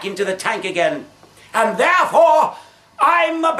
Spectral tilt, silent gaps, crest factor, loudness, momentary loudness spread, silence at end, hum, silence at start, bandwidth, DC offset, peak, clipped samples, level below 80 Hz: -3.5 dB/octave; none; 14 dB; -16 LUFS; 9 LU; 0 s; none; 0 s; 14 kHz; under 0.1%; -2 dBFS; under 0.1%; -66 dBFS